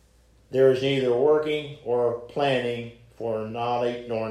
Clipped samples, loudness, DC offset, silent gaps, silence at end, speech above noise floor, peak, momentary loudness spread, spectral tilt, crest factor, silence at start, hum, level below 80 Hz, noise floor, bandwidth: under 0.1%; -25 LUFS; under 0.1%; none; 0 s; 34 dB; -8 dBFS; 10 LU; -6.5 dB/octave; 18 dB; 0.5 s; none; -60 dBFS; -58 dBFS; 11.5 kHz